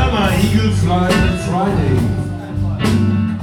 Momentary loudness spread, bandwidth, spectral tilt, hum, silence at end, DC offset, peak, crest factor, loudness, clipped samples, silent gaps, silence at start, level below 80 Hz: 7 LU; 16 kHz; -6.5 dB/octave; none; 0 s; under 0.1%; -2 dBFS; 14 dB; -16 LUFS; under 0.1%; none; 0 s; -26 dBFS